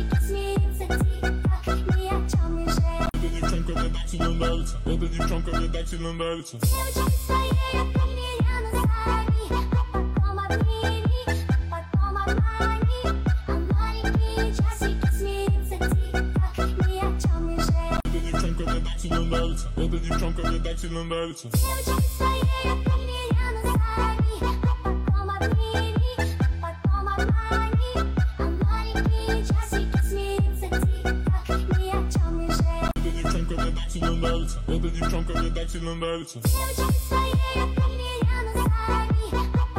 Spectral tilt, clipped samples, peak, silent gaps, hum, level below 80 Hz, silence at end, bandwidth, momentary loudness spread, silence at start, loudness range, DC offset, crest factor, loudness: -6 dB/octave; under 0.1%; -12 dBFS; none; none; -26 dBFS; 0 s; 16.5 kHz; 4 LU; 0 s; 2 LU; under 0.1%; 12 dB; -25 LUFS